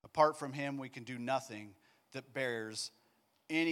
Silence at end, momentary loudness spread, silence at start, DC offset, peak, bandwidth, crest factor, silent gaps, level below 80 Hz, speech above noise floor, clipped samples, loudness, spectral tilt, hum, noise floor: 0 s; 18 LU; 0.05 s; under 0.1%; -16 dBFS; 16.5 kHz; 22 dB; none; -82 dBFS; 37 dB; under 0.1%; -38 LUFS; -4.5 dB/octave; none; -74 dBFS